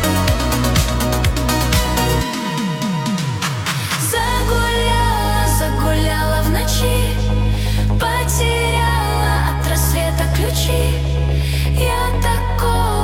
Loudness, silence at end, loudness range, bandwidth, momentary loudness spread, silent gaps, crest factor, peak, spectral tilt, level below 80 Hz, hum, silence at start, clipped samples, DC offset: -17 LUFS; 0 s; 1 LU; 17.5 kHz; 3 LU; none; 14 dB; -2 dBFS; -4.5 dB/octave; -20 dBFS; none; 0 s; under 0.1%; under 0.1%